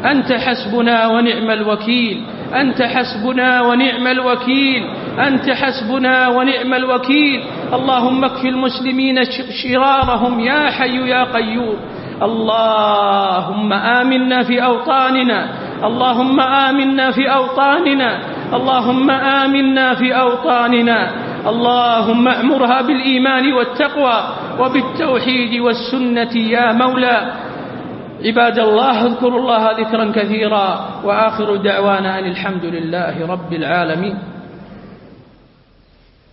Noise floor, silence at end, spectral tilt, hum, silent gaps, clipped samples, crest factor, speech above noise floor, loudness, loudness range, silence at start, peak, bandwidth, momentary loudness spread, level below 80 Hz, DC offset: -49 dBFS; 1.25 s; -10 dB/octave; none; none; under 0.1%; 14 dB; 35 dB; -14 LUFS; 3 LU; 0 s; 0 dBFS; 5.8 kHz; 8 LU; -48 dBFS; under 0.1%